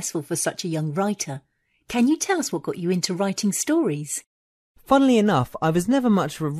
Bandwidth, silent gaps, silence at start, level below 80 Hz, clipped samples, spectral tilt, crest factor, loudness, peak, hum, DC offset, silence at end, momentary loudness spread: 14 kHz; 4.26-4.75 s; 0 s; -56 dBFS; under 0.1%; -5 dB/octave; 18 dB; -22 LUFS; -4 dBFS; none; under 0.1%; 0 s; 10 LU